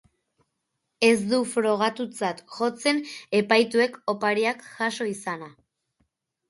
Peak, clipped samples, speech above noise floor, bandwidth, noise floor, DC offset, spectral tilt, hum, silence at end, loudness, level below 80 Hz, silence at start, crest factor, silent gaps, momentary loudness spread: -6 dBFS; under 0.1%; 55 dB; 11.5 kHz; -79 dBFS; under 0.1%; -4 dB/octave; none; 1 s; -24 LUFS; -72 dBFS; 1 s; 20 dB; none; 10 LU